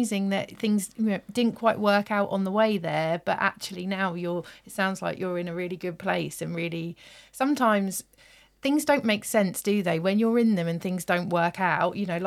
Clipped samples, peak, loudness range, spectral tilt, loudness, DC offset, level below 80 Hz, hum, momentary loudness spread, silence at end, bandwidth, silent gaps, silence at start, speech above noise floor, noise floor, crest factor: under 0.1%; -8 dBFS; 5 LU; -5 dB/octave; -26 LUFS; under 0.1%; -66 dBFS; none; 9 LU; 0 s; 16 kHz; none; 0 s; 30 dB; -56 dBFS; 18 dB